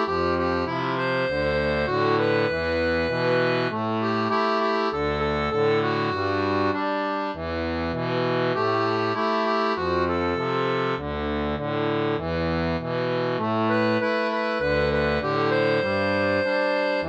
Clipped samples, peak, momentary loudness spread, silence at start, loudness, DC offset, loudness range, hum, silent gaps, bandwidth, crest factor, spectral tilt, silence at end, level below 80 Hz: under 0.1%; -12 dBFS; 4 LU; 0 s; -24 LUFS; under 0.1%; 2 LU; none; none; 8.4 kHz; 12 dB; -7 dB/octave; 0 s; -44 dBFS